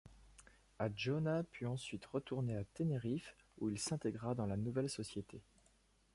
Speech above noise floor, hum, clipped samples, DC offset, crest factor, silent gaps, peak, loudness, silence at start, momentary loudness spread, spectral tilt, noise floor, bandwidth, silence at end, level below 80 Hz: 32 dB; none; under 0.1%; under 0.1%; 18 dB; none; -24 dBFS; -42 LUFS; 0.05 s; 7 LU; -6 dB/octave; -73 dBFS; 11.5 kHz; 0.75 s; -66 dBFS